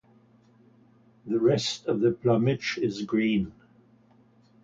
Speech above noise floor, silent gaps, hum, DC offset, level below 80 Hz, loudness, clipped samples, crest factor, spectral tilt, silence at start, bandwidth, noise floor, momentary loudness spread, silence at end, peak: 34 dB; none; none; under 0.1%; -60 dBFS; -26 LUFS; under 0.1%; 18 dB; -6 dB/octave; 1.25 s; 7.8 kHz; -60 dBFS; 7 LU; 1.1 s; -10 dBFS